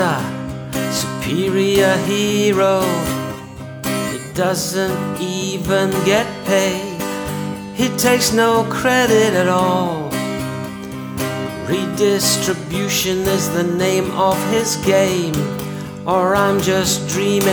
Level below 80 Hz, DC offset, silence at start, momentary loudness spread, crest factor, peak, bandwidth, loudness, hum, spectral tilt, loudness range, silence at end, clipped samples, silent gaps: -44 dBFS; under 0.1%; 0 s; 10 LU; 16 dB; -2 dBFS; over 20 kHz; -17 LUFS; none; -4 dB/octave; 3 LU; 0 s; under 0.1%; none